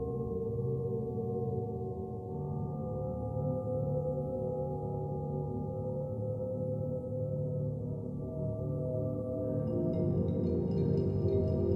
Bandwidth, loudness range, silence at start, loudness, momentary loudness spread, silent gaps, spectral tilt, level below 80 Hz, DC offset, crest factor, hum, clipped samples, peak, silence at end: 5.4 kHz; 3 LU; 0 s; -35 LUFS; 6 LU; none; -12.5 dB/octave; -50 dBFS; under 0.1%; 16 dB; none; under 0.1%; -18 dBFS; 0 s